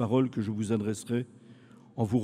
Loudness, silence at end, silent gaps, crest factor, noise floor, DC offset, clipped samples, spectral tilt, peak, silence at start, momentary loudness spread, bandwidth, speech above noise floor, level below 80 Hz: -31 LUFS; 0 s; none; 16 dB; -54 dBFS; under 0.1%; under 0.1%; -7.5 dB/octave; -14 dBFS; 0 s; 12 LU; 14.5 kHz; 25 dB; -66 dBFS